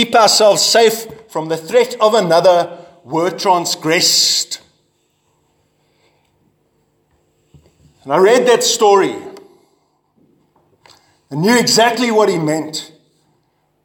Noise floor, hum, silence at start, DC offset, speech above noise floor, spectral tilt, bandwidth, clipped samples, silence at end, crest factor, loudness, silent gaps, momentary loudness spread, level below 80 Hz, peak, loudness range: -62 dBFS; none; 0 s; under 0.1%; 49 dB; -2.5 dB/octave; 18.5 kHz; under 0.1%; 1 s; 16 dB; -13 LUFS; none; 15 LU; -64 dBFS; 0 dBFS; 4 LU